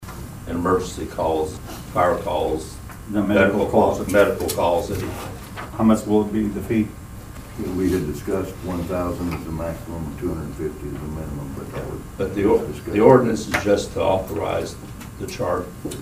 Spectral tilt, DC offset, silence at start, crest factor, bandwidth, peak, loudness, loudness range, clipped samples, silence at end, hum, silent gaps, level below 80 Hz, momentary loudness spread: -6 dB/octave; under 0.1%; 0 s; 22 dB; 15.5 kHz; 0 dBFS; -22 LUFS; 8 LU; under 0.1%; 0 s; none; none; -40 dBFS; 15 LU